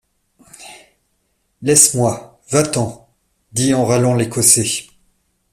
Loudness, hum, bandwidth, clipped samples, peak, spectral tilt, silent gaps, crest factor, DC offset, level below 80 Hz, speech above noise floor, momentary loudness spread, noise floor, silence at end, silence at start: -14 LUFS; none; 16 kHz; under 0.1%; 0 dBFS; -3.5 dB/octave; none; 18 dB; under 0.1%; -52 dBFS; 51 dB; 14 LU; -66 dBFS; 0.7 s; 0.6 s